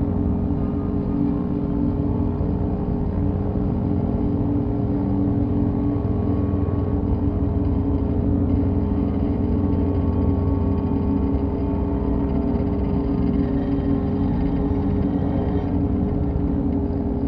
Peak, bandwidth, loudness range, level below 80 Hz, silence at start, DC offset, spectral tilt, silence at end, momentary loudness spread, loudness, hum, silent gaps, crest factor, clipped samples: -8 dBFS; 5 kHz; 1 LU; -28 dBFS; 0 s; under 0.1%; -12.5 dB/octave; 0 s; 2 LU; -22 LUFS; none; none; 12 dB; under 0.1%